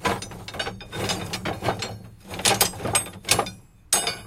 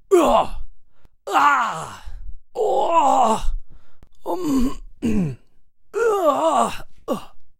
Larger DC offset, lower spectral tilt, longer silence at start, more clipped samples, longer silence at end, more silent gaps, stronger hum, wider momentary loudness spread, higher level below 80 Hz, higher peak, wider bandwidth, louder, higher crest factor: neither; second, -2 dB/octave vs -5 dB/octave; about the same, 0 s vs 0.1 s; neither; about the same, 0 s vs 0.1 s; neither; neither; second, 13 LU vs 19 LU; second, -48 dBFS vs -34 dBFS; about the same, -4 dBFS vs -4 dBFS; about the same, 17 kHz vs 16 kHz; second, -25 LUFS vs -20 LUFS; about the same, 22 dB vs 18 dB